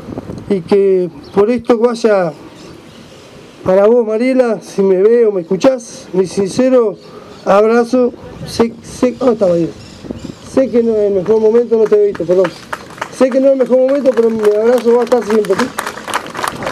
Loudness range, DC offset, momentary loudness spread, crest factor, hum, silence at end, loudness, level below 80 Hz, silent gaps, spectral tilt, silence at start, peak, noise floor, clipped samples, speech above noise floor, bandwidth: 3 LU; under 0.1%; 12 LU; 12 dB; none; 0 s; -13 LUFS; -48 dBFS; none; -6 dB/octave; 0 s; 0 dBFS; -36 dBFS; under 0.1%; 25 dB; 14 kHz